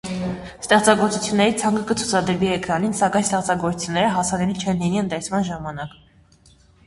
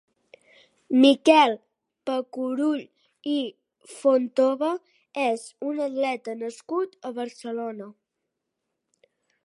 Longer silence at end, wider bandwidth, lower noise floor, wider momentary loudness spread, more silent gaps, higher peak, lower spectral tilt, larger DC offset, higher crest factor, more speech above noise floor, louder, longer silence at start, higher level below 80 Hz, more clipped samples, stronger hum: second, 0.95 s vs 1.55 s; about the same, 11.5 kHz vs 11.5 kHz; second, -53 dBFS vs -82 dBFS; second, 11 LU vs 18 LU; neither; first, 0 dBFS vs -4 dBFS; about the same, -4.5 dB/octave vs -3.5 dB/octave; neither; about the same, 20 dB vs 22 dB; second, 33 dB vs 58 dB; first, -21 LUFS vs -24 LUFS; second, 0.05 s vs 0.9 s; first, -50 dBFS vs -84 dBFS; neither; neither